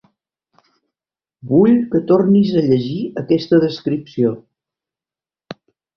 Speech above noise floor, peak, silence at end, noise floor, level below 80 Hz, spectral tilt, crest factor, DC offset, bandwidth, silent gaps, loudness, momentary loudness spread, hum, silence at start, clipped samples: over 75 dB; -2 dBFS; 0.45 s; under -90 dBFS; -56 dBFS; -9 dB/octave; 16 dB; under 0.1%; 6.4 kHz; none; -16 LUFS; 23 LU; none; 1.45 s; under 0.1%